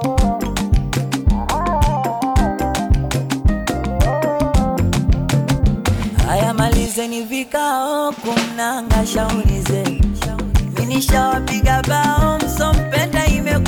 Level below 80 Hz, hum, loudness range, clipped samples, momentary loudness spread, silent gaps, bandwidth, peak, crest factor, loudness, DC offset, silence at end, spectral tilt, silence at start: -22 dBFS; none; 2 LU; under 0.1%; 4 LU; none; 19 kHz; -6 dBFS; 10 dB; -18 LUFS; under 0.1%; 0 s; -5.5 dB/octave; 0 s